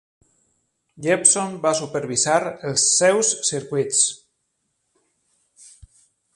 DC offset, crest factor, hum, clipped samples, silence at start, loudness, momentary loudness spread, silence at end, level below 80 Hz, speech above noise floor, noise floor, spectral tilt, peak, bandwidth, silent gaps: under 0.1%; 22 dB; none; under 0.1%; 1 s; -19 LUFS; 9 LU; 2.2 s; -64 dBFS; 53 dB; -73 dBFS; -2 dB/octave; -2 dBFS; 11.5 kHz; none